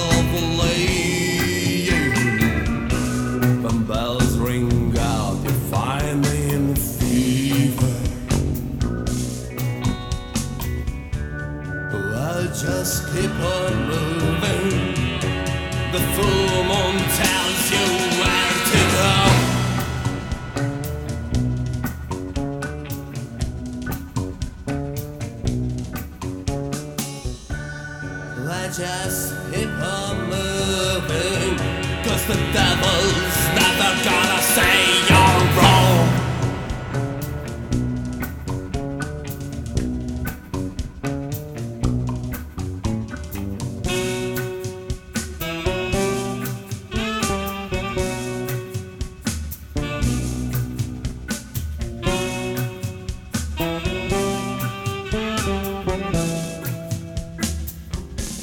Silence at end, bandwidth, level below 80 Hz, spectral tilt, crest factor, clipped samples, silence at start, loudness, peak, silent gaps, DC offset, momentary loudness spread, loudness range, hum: 0 s; over 20 kHz; -32 dBFS; -4.5 dB/octave; 20 dB; under 0.1%; 0 s; -22 LUFS; 0 dBFS; none; under 0.1%; 13 LU; 11 LU; none